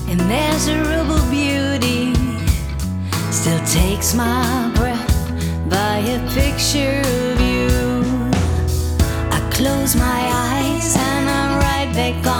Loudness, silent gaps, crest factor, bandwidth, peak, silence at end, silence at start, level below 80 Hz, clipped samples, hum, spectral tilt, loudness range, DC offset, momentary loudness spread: -18 LUFS; none; 14 dB; over 20 kHz; -2 dBFS; 0 s; 0 s; -24 dBFS; under 0.1%; none; -4.5 dB/octave; 1 LU; under 0.1%; 4 LU